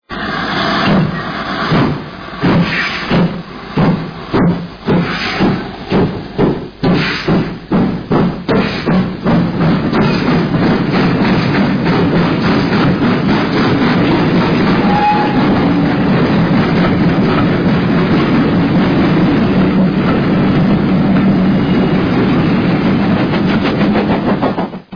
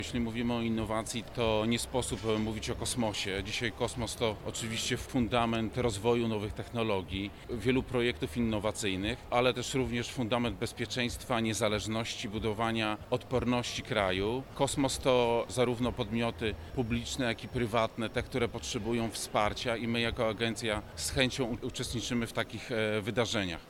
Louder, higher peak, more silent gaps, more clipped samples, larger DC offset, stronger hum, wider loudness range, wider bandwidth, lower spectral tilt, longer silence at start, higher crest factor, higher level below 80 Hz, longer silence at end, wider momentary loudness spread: first, -13 LUFS vs -32 LUFS; first, 0 dBFS vs -12 dBFS; neither; neither; neither; neither; about the same, 3 LU vs 2 LU; second, 5.4 kHz vs 17 kHz; first, -8 dB/octave vs -4.5 dB/octave; about the same, 0.1 s vs 0 s; second, 12 dB vs 22 dB; first, -32 dBFS vs -50 dBFS; about the same, 0 s vs 0 s; about the same, 5 LU vs 5 LU